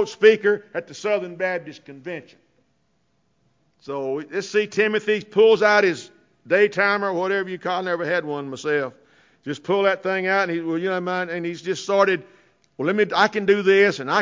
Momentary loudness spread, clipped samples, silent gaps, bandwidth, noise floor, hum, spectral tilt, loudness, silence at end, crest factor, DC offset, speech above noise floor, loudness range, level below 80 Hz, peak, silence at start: 16 LU; under 0.1%; none; 7.6 kHz; -68 dBFS; none; -5 dB/octave; -21 LUFS; 0 s; 18 dB; under 0.1%; 47 dB; 10 LU; -70 dBFS; -4 dBFS; 0 s